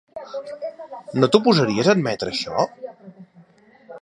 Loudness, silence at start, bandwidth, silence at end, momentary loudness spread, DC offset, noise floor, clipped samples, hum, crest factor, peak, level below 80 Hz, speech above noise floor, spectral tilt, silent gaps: -20 LUFS; 0.15 s; 11 kHz; 0.05 s; 18 LU; under 0.1%; -52 dBFS; under 0.1%; none; 22 dB; 0 dBFS; -60 dBFS; 32 dB; -5.5 dB/octave; none